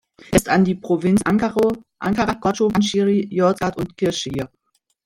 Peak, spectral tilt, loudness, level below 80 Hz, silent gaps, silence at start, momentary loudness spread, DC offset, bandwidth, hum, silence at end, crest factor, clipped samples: -2 dBFS; -5.5 dB/octave; -19 LUFS; -44 dBFS; none; 0.3 s; 7 LU; under 0.1%; 15.5 kHz; none; 0.6 s; 18 dB; under 0.1%